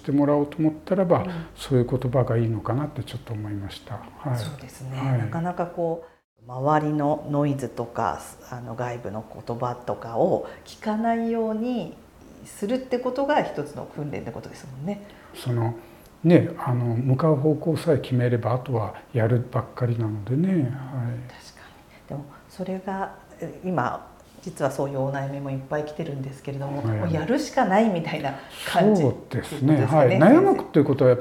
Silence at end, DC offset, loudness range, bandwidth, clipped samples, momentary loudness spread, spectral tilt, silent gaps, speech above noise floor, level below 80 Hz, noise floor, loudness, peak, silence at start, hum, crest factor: 0 s; under 0.1%; 7 LU; 15 kHz; under 0.1%; 16 LU; -7.5 dB/octave; 6.24-6.36 s; 25 dB; -56 dBFS; -48 dBFS; -24 LUFS; -4 dBFS; 0.05 s; none; 22 dB